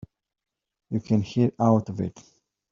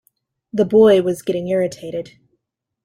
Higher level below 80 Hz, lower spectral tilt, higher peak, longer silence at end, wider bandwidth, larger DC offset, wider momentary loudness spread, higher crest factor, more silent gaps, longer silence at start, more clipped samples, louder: about the same, -62 dBFS vs -58 dBFS; first, -9 dB/octave vs -6.5 dB/octave; second, -8 dBFS vs -2 dBFS; second, 0.6 s vs 0.8 s; second, 7.4 kHz vs 15 kHz; neither; second, 11 LU vs 17 LU; about the same, 18 dB vs 16 dB; neither; first, 0.9 s vs 0.55 s; neither; second, -25 LUFS vs -17 LUFS